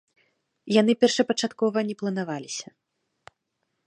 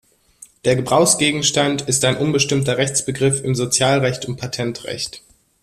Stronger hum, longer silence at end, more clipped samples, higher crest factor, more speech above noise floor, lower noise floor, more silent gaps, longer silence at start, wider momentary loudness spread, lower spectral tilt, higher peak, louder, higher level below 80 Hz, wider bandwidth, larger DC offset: neither; first, 1.25 s vs 0.45 s; neither; about the same, 20 dB vs 18 dB; first, 54 dB vs 29 dB; first, -78 dBFS vs -47 dBFS; neither; about the same, 0.65 s vs 0.65 s; first, 14 LU vs 11 LU; about the same, -4.5 dB/octave vs -3.5 dB/octave; second, -6 dBFS vs 0 dBFS; second, -24 LUFS vs -18 LUFS; second, -76 dBFS vs -52 dBFS; second, 10.5 kHz vs 14.5 kHz; neither